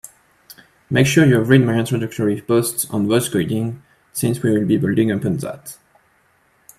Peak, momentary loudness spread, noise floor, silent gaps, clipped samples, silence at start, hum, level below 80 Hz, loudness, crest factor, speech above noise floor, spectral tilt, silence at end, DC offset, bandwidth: 0 dBFS; 14 LU; -59 dBFS; none; under 0.1%; 0.9 s; none; -54 dBFS; -18 LUFS; 18 dB; 42 dB; -5.5 dB/octave; 1.05 s; under 0.1%; 15 kHz